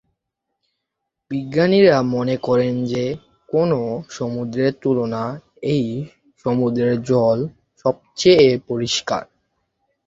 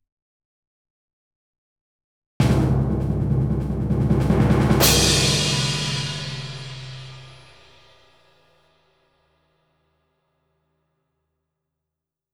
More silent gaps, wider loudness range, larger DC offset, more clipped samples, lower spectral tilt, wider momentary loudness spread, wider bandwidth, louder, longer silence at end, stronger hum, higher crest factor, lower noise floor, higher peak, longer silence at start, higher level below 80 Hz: neither; second, 4 LU vs 15 LU; neither; neither; first, -6 dB/octave vs -4.5 dB/octave; second, 14 LU vs 19 LU; second, 7.8 kHz vs over 20 kHz; about the same, -19 LUFS vs -20 LUFS; second, 0.85 s vs 5 s; neither; about the same, 18 dB vs 22 dB; second, -79 dBFS vs -85 dBFS; about the same, -2 dBFS vs -2 dBFS; second, 1.3 s vs 2.4 s; second, -54 dBFS vs -34 dBFS